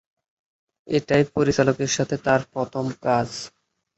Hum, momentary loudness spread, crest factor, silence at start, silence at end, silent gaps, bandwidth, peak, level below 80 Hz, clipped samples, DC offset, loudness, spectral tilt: none; 9 LU; 18 dB; 0.85 s; 0.5 s; none; 8.2 kHz; -4 dBFS; -54 dBFS; under 0.1%; under 0.1%; -22 LUFS; -5 dB/octave